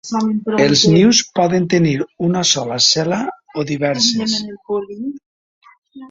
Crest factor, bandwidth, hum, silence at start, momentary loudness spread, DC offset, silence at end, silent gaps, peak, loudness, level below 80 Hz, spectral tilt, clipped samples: 16 dB; 7.8 kHz; none; 0.05 s; 13 LU; under 0.1%; 0.05 s; 5.26-5.61 s, 5.78-5.82 s; 0 dBFS; -15 LUFS; -52 dBFS; -4 dB/octave; under 0.1%